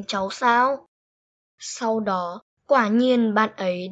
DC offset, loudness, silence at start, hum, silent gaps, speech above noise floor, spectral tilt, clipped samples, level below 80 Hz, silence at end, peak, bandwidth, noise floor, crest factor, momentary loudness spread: under 0.1%; -21 LUFS; 0 s; none; 0.88-1.58 s, 2.42-2.57 s; over 68 dB; -4.5 dB/octave; under 0.1%; -68 dBFS; 0 s; -6 dBFS; 8.4 kHz; under -90 dBFS; 16 dB; 14 LU